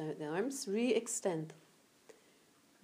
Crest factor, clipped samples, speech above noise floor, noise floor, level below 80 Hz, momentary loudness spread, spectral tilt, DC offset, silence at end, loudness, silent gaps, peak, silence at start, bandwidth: 20 dB; under 0.1%; 31 dB; -68 dBFS; under -90 dBFS; 8 LU; -4 dB/octave; under 0.1%; 0.7 s; -37 LUFS; none; -20 dBFS; 0 s; 15.5 kHz